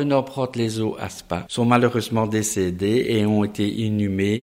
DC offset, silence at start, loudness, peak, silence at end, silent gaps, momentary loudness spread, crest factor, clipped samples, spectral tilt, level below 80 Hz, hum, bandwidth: under 0.1%; 0 s; -22 LUFS; -2 dBFS; 0.05 s; none; 8 LU; 20 dB; under 0.1%; -5.5 dB/octave; -52 dBFS; none; 16 kHz